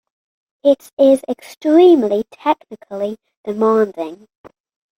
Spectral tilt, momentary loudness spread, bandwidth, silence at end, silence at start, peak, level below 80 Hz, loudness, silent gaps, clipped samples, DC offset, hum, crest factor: -6 dB/octave; 17 LU; 15.5 kHz; 0.85 s; 0.65 s; -2 dBFS; -66 dBFS; -15 LUFS; 0.93-0.97 s, 3.37-3.44 s; under 0.1%; under 0.1%; none; 16 dB